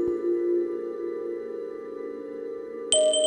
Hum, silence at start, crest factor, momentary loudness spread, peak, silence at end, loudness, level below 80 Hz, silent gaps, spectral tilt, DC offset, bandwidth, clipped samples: none; 0 s; 22 dB; 13 LU; -6 dBFS; 0 s; -29 LUFS; -66 dBFS; none; -1.5 dB/octave; under 0.1%; 11 kHz; under 0.1%